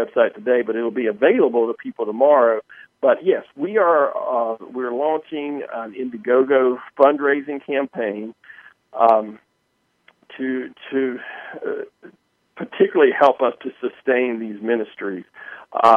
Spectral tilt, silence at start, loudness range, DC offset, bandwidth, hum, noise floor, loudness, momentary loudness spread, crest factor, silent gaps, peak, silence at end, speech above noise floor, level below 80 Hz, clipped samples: -7 dB/octave; 0 s; 5 LU; under 0.1%; 5.8 kHz; none; -68 dBFS; -20 LUFS; 14 LU; 20 dB; none; 0 dBFS; 0 s; 49 dB; -72 dBFS; under 0.1%